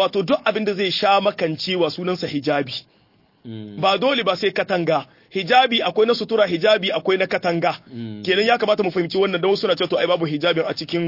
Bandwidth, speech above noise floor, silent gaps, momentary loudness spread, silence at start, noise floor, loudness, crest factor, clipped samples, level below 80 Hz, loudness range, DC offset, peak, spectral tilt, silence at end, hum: 5.8 kHz; 38 dB; none; 8 LU; 0 s; -58 dBFS; -19 LUFS; 18 dB; under 0.1%; -66 dBFS; 3 LU; under 0.1%; -2 dBFS; -5.5 dB/octave; 0 s; none